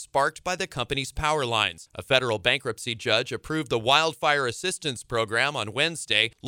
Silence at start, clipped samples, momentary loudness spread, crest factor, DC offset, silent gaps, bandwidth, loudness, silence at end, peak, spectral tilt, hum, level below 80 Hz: 0 s; under 0.1%; 8 LU; 22 dB; under 0.1%; none; 17 kHz; -25 LUFS; 0 s; -4 dBFS; -3 dB/octave; none; -50 dBFS